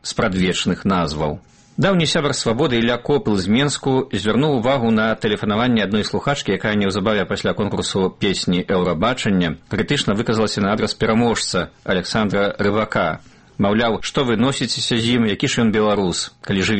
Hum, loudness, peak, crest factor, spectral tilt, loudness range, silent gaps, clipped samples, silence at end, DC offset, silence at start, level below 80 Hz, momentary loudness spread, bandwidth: none; -19 LUFS; -4 dBFS; 14 dB; -5 dB/octave; 1 LU; none; under 0.1%; 0 s; under 0.1%; 0.05 s; -44 dBFS; 5 LU; 8.8 kHz